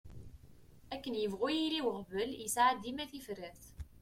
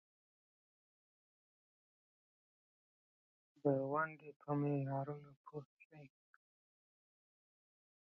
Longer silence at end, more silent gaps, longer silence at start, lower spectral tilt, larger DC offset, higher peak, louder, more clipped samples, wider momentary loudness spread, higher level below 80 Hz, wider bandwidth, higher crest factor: second, 0 s vs 2.05 s; second, none vs 4.36-4.40 s, 5.37-5.44 s, 5.65-5.77 s, 5.85-5.90 s; second, 0.05 s vs 3.65 s; second, -3.5 dB/octave vs -9.5 dB/octave; neither; first, -16 dBFS vs -22 dBFS; first, -36 LUFS vs -40 LUFS; neither; about the same, 21 LU vs 20 LU; first, -60 dBFS vs -86 dBFS; first, 16.5 kHz vs 3.1 kHz; about the same, 20 dB vs 24 dB